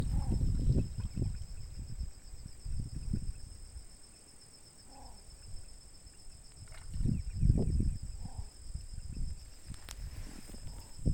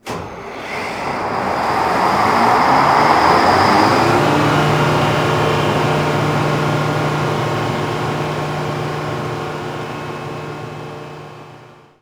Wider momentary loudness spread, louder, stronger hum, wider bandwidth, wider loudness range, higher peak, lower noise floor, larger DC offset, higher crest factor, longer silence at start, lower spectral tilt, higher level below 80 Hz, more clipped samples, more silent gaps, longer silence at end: first, 21 LU vs 16 LU; second, -39 LUFS vs -16 LUFS; neither; second, 17 kHz vs over 20 kHz; first, 14 LU vs 11 LU; second, -12 dBFS vs 0 dBFS; first, -56 dBFS vs -42 dBFS; neither; first, 24 dB vs 16 dB; about the same, 0 s vs 0.05 s; about the same, -6.5 dB/octave vs -5.5 dB/octave; about the same, -40 dBFS vs -44 dBFS; neither; neither; second, 0 s vs 0.4 s